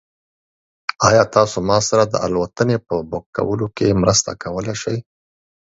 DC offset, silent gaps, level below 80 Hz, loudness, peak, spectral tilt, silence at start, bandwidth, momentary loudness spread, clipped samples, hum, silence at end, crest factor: under 0.1%; 3.26-3.33 s; -44 dBFS; -18 LUFS; 0 dBFS; -4.5 dB/octave; 1 s; 8 kHz; 11 LU; under 0.1%; none; 0.65 s; 18 dB